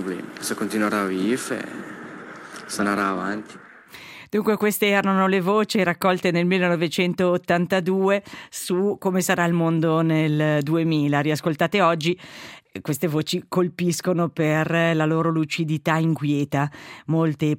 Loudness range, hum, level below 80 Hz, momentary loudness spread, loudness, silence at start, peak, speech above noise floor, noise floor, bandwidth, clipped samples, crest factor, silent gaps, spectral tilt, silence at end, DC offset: 5 LU; none; -66 dBFS; 14 LU; -22 LUFS; 0 s; -4 dBFS; 22 dB; -43 dBFS; 16.5 kHz; under 0.1%; 18 dB; none; -5.5 dB/octave; 0 s; under 0.1%